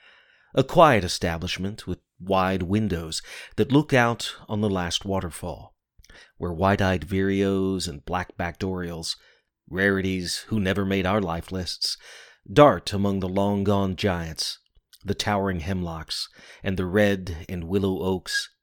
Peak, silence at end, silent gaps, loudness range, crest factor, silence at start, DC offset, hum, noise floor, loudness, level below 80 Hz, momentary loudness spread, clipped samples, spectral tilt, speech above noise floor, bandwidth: -2 dBFS; 0.15 s; none; 4 LU; 24 dB; 0.55 s; under 0.1%; none; -56 dBFS; -24 LUFS; -46 dBFS; 14 LU; under 0.1%; -5.5 dB/octave; 32 dB; 18.5 kHz